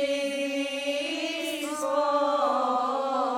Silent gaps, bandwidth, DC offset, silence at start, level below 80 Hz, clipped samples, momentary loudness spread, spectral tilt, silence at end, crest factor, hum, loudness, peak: none; 17.5 kHz; under 0.1%; 0 s; -76 dBFS; under 0.1%; 5 LU; -1.5 dB/octave; 0 s; 14 dB; none; -27 LUFS; -14 dBFS